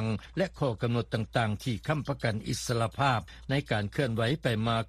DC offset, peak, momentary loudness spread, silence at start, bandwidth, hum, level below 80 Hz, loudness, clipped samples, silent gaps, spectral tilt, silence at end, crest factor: under 0.1%; -12 dBFS; 4 LU; 0 s; 14.5 kHz; none; -50 dBFS; -30 LUFS; under 0.1%; none; -5.5 dB/octave; 0 s; 18 dB